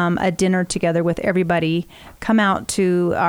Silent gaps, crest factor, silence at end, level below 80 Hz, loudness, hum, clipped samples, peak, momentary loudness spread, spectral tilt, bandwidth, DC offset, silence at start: none; 14 dB; 0 s; -46 dBFS; -19 LUFS; none; under 0.1%; -4 dBFS; 6 LU; -5.5 dB/octave; 16 kHz; under 0.1%; 0 s